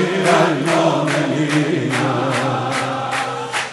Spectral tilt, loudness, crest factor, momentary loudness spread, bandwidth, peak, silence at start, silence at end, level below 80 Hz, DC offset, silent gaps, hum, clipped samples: -5 dB/octave; -18 LUFS; 16 dB; 6 LU; 11.5 kHz; 0 dBFS; 0 s; 0 s; -60 dBFS; under 0.1%; none; none; under 0.1%